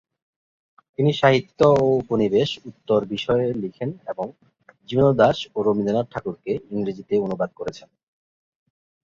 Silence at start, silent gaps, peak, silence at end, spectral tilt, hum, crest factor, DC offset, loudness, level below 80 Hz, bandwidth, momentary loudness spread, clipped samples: 1 s; none; -2 dBFS; 1.25 s; -7 dB/octave; none; 20 dB; under 0.1%; -22 LUFS; -54 dBFS; 7.6 kHz; 14 LU; under 0.1%